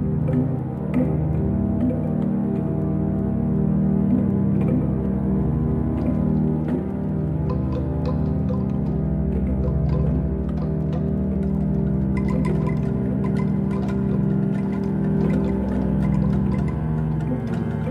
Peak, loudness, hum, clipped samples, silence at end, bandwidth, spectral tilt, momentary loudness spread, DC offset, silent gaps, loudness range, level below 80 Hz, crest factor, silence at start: -8 dBFS; -22 LUFS; none; under 0.1%; 0 s; 5.2 kHz; -11 dB/octave; 4 LU; under 0.1%; none; 2 LU; -32 dBFS; 12 dB; 0 s